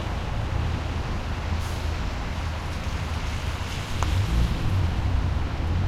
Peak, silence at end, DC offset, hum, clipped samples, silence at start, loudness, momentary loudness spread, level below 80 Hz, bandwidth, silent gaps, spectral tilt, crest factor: -6 dBFS; 0 s; under 0.1%; none; under 0.1%; 0 s; -28 LUFS; 5 LU; -30 dBFS; 14 kHz; none; -6 dB/octave; 20 dB